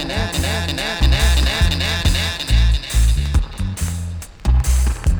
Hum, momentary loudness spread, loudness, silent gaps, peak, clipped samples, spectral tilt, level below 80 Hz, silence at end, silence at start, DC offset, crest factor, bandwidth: none; 8 LU; -18 LUFS; none; -2 dBFS; under 0.1%; -4 dB/octave; -18 dBFS; 0 s; 0 s; under 0.1%; 14 dB; over 20 kHz